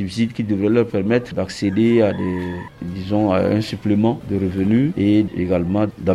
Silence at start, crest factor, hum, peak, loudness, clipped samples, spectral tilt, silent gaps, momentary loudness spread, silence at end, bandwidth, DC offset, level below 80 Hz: 0 s; 14 dB; none; -4 dBFS; -19 LUFS; under 0.1%; -8 dB/octave; none; 8 LU; 0 s; 12 kHz; under 0.1%; -48 dBFS